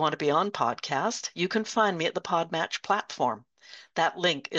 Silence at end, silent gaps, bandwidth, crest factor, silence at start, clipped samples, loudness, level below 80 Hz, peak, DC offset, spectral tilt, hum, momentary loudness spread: 0 s; none; 8.6 kHz; 18 dB; 0 s; under 0.1%; -28 LUFS; -76 dBFS; -10 dBFS; under 0.1%; -3.5 dB/octave; none; 5 LU